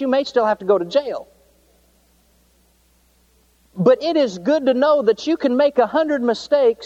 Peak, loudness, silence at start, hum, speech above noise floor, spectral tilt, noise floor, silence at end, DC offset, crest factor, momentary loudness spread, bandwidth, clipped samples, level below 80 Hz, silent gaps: -4 dBFS; -18 LUFS; 0 s; none; 41 dB; -6 dB/octave; -58 dBFS; 0 s; under 0.1%; 16 dB; 5 LU; 8.2 kHz; under 0.1%; -60 dBFS; none